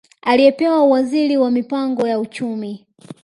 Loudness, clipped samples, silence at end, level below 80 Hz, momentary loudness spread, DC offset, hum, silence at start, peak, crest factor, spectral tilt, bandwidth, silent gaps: -16 LUFS; under 0.1%; 0.1 s; -66 dBFS; 12 LU; under 0.1%; none; 0.25 s; 0 dBFS; 16 dB; -6 dB/octave; 11.5 kHz; none